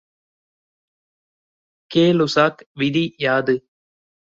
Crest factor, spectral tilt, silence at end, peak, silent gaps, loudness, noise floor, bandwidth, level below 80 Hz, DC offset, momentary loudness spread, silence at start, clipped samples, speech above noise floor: 20 dB; -6 dB/octave; 0.75 s; -2 dBFS; 2.66-2.75 s; -19 LUFS; under -90 dBFS; 7.8 kHz; -62 dBFS; under 0.1%; 7 LU; 1.9 s; under 0.1%; over 72 dB